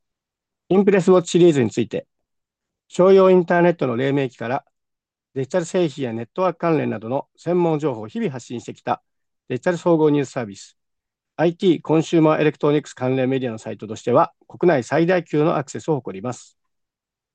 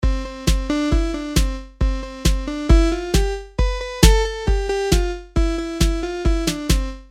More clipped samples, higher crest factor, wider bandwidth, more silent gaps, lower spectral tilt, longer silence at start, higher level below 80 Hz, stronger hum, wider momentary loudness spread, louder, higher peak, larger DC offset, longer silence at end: neither; about the same, 16 dB vs 18 dB; second, 9.2 kHz vs 16 kHz; neither; first, -7 dB/octave vs -5 dB/octave; first, 0.7 s vs 0 s; second, -68 dBFS vs -20 dBFS; neither; first, 15 LU vs 8 LU; about the same, -19 LUFS vs -21 LUFS; second, -4 dBFS vs 0 dBFS; neither; first, 0.95 s vs 0.05 s